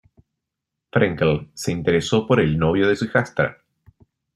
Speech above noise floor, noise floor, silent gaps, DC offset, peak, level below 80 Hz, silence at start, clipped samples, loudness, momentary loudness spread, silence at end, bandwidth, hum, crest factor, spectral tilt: 63 dB; -83 dBFS; none; under 0.1%; -2 dBFS; -48 dBFS; 0.95 s; under 0.1%; -20 LUFS; 7 LU; 0.8 s; 13.5 kHz; none; 18 dB; -6 dB/octave